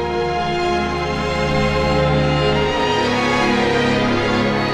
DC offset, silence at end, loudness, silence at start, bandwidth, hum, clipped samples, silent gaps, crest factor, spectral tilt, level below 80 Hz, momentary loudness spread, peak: under 0.1%; 0 s; -17 LUFS; 0 s; 12 kHz; none; under 0.1%; none; 14 dB; -5.5 dB/octave; -32 dBFS; 4 LU; -4 dBFS